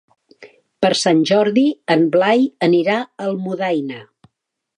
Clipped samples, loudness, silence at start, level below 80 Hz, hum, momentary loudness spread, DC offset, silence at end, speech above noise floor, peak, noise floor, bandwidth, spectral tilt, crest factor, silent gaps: under 0.1%; -17 LUFS; 0.4 s; -66 dBFS; none; 9 LU; under 0.1%; 0.75 s; 61 dB; -2 dBFS; -77 dBFS; 11 kHz; -5 dB/octave; 16 dB; none